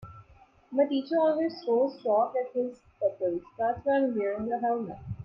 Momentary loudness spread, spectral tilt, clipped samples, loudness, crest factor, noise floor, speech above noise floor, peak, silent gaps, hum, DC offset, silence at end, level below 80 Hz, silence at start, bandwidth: 7 LU; -8.5 dB/octave; under 0.1%; -29 LUFS; 16 dB; -58 dBFS; 30 dB; -14 dBFS; none; none; under 0.1%; 0 s; -62 dBFS; 0 s; 5.8 kHz